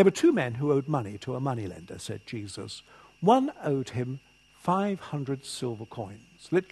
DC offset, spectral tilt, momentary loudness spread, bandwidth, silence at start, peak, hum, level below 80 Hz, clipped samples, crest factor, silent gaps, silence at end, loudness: under 0.1%; -6.5 dB/octave; 16 LU; 12.5 kHz; 0 s; -6 dBFS; none; -66 dBFS; under 0.1%; 22 dB; none; 0.05 s; -29 LUFS